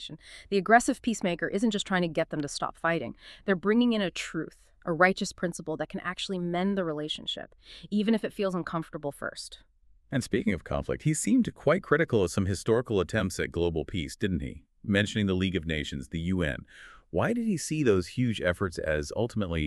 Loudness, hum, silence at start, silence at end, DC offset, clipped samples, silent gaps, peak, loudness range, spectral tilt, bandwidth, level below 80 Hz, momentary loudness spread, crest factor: -29 LUFS; none; 0 s; 0 s; under 0.1%; under 0.1%; none; -6 dBFS; 4 LU; -5 dB/octave; 13 kHz; -50 dBFS; 11 LU; 22 dB